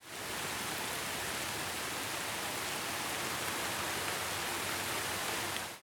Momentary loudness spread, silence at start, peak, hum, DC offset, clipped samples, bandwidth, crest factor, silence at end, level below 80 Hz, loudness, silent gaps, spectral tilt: 2 LU; 0 s; -18 dBFS; none; under 0.1%; under 0.1%; over 20 kHz; 20 dB; 0 s; -66 dBFS; -36 LUFS; none; -1.5 dB/octave